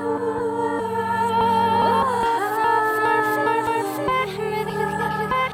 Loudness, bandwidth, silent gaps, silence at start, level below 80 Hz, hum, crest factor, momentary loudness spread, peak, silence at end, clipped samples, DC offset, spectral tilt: -21 LUFS; 17 kHz; none; 0 s; -52 dBFS; none; 12 dB; 6 LU; -8 dBFS; 0 s; under 0.1%; under 0.1%; -5 dB/octave